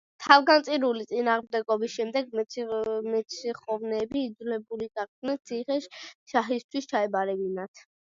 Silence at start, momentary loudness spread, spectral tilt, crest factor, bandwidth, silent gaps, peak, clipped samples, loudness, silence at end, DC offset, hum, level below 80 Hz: 0.2 s; 13 LU; -4 dB/octave; 26 dB; 7.6 kHz; 5.08-5.22 s, 6.15-6.26 s, 6.64-6.69 s, 7.68-7.74 s; -2 dBFS; under 0.1%; -27 LUFS; 0.3 s; under 0.1%; none; -72 dBFS